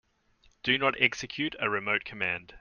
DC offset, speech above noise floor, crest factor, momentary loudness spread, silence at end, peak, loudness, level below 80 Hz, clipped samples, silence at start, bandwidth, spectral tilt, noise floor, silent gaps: under 0.1%; 35 dB; 26 dB; 8 LU; 0 s; -6 dBFS; -28 LUFS; -62 dBFS; under 0.1%; 0.65 s; 10 kHz; -3.5 dB/octave; -65 dBFS; none